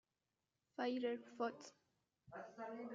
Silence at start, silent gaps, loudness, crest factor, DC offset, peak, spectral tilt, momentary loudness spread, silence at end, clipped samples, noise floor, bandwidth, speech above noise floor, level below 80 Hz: 0.8 s; none; -46 LUFS; 20 dB; under 0.1%; -28 dBFS; -3 dB/octave; 16 LU; 0 s; under 0.1%; under -90 dBFS; 7.4 kHz; over 44 dB; under -90 dBFS